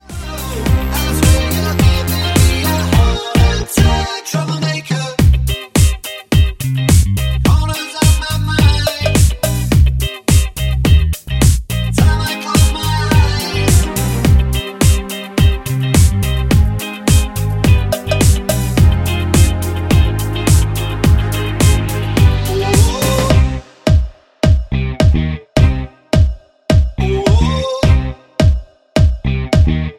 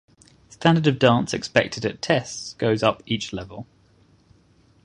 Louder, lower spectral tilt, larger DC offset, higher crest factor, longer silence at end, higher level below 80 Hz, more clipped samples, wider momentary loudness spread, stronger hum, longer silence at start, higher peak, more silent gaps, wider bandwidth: first, -14 LUFS vs -22 LUFS; about the same, -5.5 dB/octave vs -5.5 dB/octave; neither; second, 12 dB vs 22 dB; second, 0.05 s vs 1.2 s; first, -18 dBFS vs -54 dBFS; neither; second, 6 LU vs 14 LU; neither; second, 0.1 s vs 0.6 s; about the same, 0 dBFS vs -2 dBFS; neither; first, 17 kHz vs 11 kHz